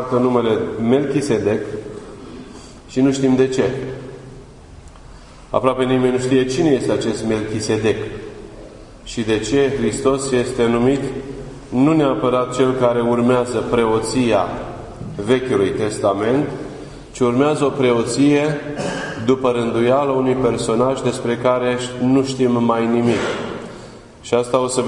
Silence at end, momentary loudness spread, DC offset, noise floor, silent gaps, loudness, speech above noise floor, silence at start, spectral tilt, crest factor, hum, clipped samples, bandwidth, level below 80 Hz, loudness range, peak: 0 s; 16 LU; under 0.1%; -39 dBFS; none; -18 LUFS; 22 dB; 0 s; -6 dB/octave; 18 dB; none; under 0.1%; 11 kHz; -44 dBFS; 3 LU; 0 dBFS